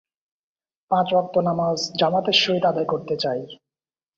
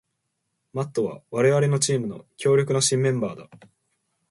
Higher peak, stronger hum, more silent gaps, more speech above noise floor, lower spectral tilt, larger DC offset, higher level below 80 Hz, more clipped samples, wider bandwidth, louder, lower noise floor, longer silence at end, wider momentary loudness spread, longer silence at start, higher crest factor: first, -4 dBFS vs -8 dBFS; neither; neither; first, over 69 dB vs 54 dB; about the same, -4.5 dB/octave vs -4.5 dB/octave; neither; about the same, -64 dBFS vs -66 dBFS; neither; second, 7.6 kHz vs 11.5 kHz; about the same, -21 LUFS vs -23 LUFS; first, under -90 dBFS vs -77 dBFS; about the same, 0.65 s vs 0.75 s; second, 8 LU vs 12 LU; first, 0.9 s vs 0.75 s; about the same, 20 dB vs 16 dB